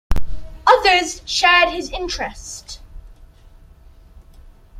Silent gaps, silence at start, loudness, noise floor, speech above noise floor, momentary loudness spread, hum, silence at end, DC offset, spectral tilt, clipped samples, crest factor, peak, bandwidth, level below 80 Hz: none; 0.1 s; -16 LUFS; -45 dBFS; 27 dB; 22 LU; none; 0 s; under 0.1%; -2.5 dB/octave; under 0.1%; 18 dB; -2 dBFS; 14.5 kHz; -32 dBFS